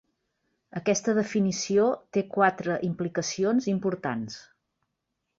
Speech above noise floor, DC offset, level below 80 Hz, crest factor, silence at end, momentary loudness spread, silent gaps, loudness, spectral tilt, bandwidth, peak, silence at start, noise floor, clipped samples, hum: 55 dB; under 0.1%; -68 dBFS; 20 dB; 1 s; 8 LU; none; -27 LUFS; -5 dB/octave; 7.8 kHz; -8 dBFS; 0.75 s; -81 dBFS; under 0.1%; none